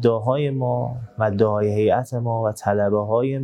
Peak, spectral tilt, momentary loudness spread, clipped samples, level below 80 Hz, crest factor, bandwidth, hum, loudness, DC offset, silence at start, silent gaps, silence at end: -4 dBFS; -8 dB/octave; 5 LU; under 0.1%; -58 dBFS; 16 dB; 12.5 kHz; none; -21 LUFS; under 0.1%; 0 s; none; 0 s